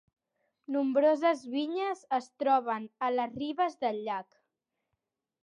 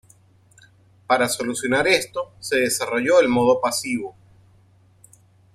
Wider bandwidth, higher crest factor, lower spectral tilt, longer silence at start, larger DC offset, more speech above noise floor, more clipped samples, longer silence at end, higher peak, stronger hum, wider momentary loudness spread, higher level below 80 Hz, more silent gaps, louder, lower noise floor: second, 10.5 kHz vs 15 kHz; about the same, 18 dB vs 18 dB; first, -5 dB/octave vs -3 dB/octave; second, 0.7 s vs 1.1 s; neither; first, 55 dB vs 35 dB; neither; second, 1.2 s vs 1.45 s; second, -14 dBFS vs -4 dBFS; neither; about the same, 10 LU vs 11 LU; second, -78 dBFS vs -60 dBFS; neither; second, -31 LUFS vs -20 LUFS; first, -85 dBFS vs -55 dBFS